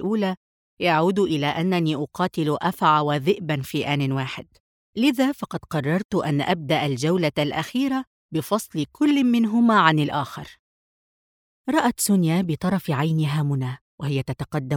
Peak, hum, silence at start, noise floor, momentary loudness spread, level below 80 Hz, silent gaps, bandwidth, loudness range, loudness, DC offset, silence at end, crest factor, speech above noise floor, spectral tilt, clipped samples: 0 dBFS; none; 0 s; under -90 dBFS; 10 LU; -58 dBFS; 0.37-0.77 s, 4.60-4.93 s, 6.05-6.09 s, 8.07-8.29 s, 10.59-11.65 s, 13.81-13.98 s; 19.5 kHz; 3 LU; -22 LUFS; under 0.1%; 0 s; 22 dB; over 68 dB; -5.5 dB/octave; under 0.1%